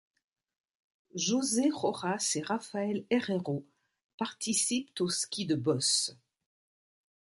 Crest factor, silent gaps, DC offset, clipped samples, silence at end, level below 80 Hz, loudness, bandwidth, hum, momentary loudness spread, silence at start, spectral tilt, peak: 20 dB; 4.04-4.18 s; under 0.1%; under 0.1%; 1.15 s; -76 dBFS; -31 LUFS; 11.5 kHz; none; 9 LU; 1.15 s; -3.5 dB/octave; -14 dBFS